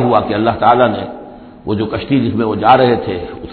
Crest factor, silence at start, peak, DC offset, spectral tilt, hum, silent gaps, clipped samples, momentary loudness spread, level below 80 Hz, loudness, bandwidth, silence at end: 14 dB; 0 s; 0 dBFS; under 0.1%; -10 dB/octave; none; none; under 0.1%; 14 LU; -42 dBFS; -14 LUFS; 4.6 kHz; 0 s